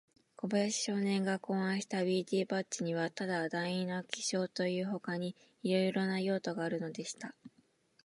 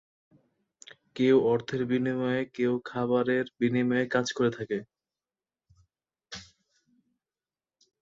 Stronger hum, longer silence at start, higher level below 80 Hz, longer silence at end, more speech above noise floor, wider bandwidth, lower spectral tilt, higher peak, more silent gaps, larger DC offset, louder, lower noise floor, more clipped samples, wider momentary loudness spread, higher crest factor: neither; second, 0.4 s vs 1.15 s; second, -84 dBFS vs -68 dBFS; second, 0.6 s vs 1.6 s; second, 35 dB vs over 63 dB; first, 11.5 kHz vs 7.6 kHz; second, -4.5 dB/octave vs -6 dB/octave; second, -14 dBFS vs -10 dBFS; neither; neither; second, -35 LUFS vs -28 LUFS; second, -70 dBFS vs under -90 dBFS; neither; second, 8 LU vs 18 LU; about the same, 20 dB vs 20 dB